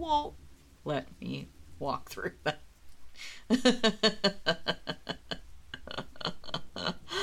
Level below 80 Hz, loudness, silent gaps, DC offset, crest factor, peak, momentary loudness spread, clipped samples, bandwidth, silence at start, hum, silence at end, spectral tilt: -56 dBFS; -33 LUFS; none; under 0.1%; 24 dB; -10 dBFS; 18 LU; under 0.1%; 16 kHz; 0 s; none; 0 s; -4 dB/octave